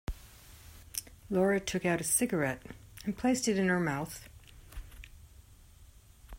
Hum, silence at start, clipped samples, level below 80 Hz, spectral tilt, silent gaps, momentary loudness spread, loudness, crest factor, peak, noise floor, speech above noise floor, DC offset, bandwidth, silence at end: none; 0.1 s; under 0.1%; -52 dBFS; -4.5 dB/octave; none; 24 LU; -31 LUFS; 22 dB; -14 dBFS; -57 dBFS; 26 dB; under 0.1%; 16 kHz; 0 s